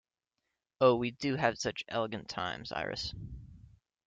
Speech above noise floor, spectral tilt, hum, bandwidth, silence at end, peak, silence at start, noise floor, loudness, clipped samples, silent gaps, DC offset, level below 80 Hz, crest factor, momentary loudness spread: 54 dB; -5 dB/octave; none; 9 kHz; 0.5 s; -12 dBFS; 0.8 s; -86 dBFS; -33 LUFS; under 0.1%; none; under 0.1%; -58 dBFS; 22 dB; 14 LU